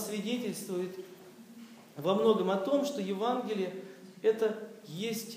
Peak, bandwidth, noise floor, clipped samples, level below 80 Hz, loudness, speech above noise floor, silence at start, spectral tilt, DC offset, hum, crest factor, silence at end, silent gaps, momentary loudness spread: -14 dBFS; 15.5 kHz; -52 dBFS; under 0.1%; -90 dBFS; -32 LUFS; 20 dB; 0 s; -5 dB/octave; under 0.1%; none; 20 dB; 0 s; none; 22 LU